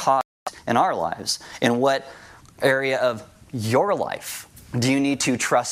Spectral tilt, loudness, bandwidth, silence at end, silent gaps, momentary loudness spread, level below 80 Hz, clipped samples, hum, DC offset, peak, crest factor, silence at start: -4 dB/octave; -23 LUFS; 16 kHz; 0 s; 0.25-0.46 s; 13 LU; -60 dBFS; under 0.1%; none; under 0.1%; -4 dBFS; 18 dB; 0 s